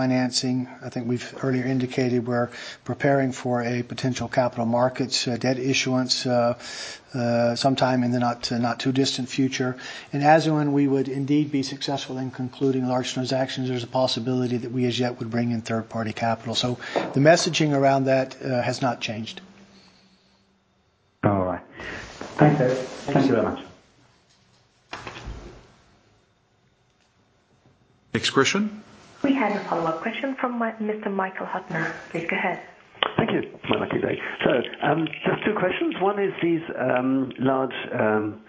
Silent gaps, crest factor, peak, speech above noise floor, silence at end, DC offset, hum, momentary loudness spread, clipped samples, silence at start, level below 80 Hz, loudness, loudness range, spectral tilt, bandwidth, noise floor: none; 22 dB; -2 dBFS; 41 dB; 0.05 s; under 0.1%; none; 11 LU; under 0.1%; 0 s; -56 dBFS; -24 LUFS; 6 LU; -5 dB/octave; 8 kHz; -65 dBFS